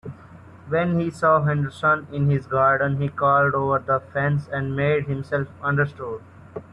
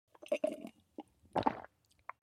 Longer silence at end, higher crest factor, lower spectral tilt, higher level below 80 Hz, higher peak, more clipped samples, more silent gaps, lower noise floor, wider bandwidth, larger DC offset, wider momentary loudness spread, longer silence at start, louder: second, 0.1 s vs 0.55 s; second, 16 dB vs 28 dB; first, -8.5 dB/octave vs -6 dB/octave; first, -54 dBFS vs -70 dBFS; first, -6 dBFS vs -14 dBFS; neither; neither; second, -45 dBFS vs -58 dBFS; second, 9.8 kHz vs 14.5 kHz; neither; second, 9 LU vs 18 LU; second, 0.05 s vs 0.2 s; first, -22 LUFS vs -39 LUFS